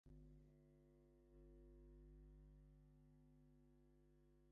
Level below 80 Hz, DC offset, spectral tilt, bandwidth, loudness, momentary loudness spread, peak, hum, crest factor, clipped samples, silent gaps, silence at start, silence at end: -70 dBFS; under 0.1%; -10 dB/octave; 2.1 kHz; -68 LUFS; 2 LU; -56 dBFS; 50 Hz at -70 dBFS; 12 dB; under 0.1%; none; 0.05 s; 0 s